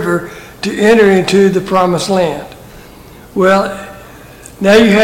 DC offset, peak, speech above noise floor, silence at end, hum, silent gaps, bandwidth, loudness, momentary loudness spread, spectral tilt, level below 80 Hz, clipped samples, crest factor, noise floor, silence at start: under 0.1%; 0 dBFS; 25 dB; 0 s; none; none; 17 kHz; -11 LUFS; 18 LU; -5.5 dB/octave; -42 dBFS; under 0.1%; 12 dB; -36 dBFS; 0 s